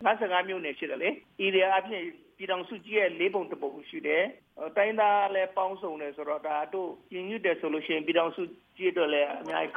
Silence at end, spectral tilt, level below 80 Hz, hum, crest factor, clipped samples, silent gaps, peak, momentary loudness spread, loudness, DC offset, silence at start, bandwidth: 0 s; -6 dB/octave; -78 dBFS; none; 18 dB; under 0.1%; none; -10 dBFS; 12 LU; -29 LUFS; under 0.1%; 0 s; 5 kHz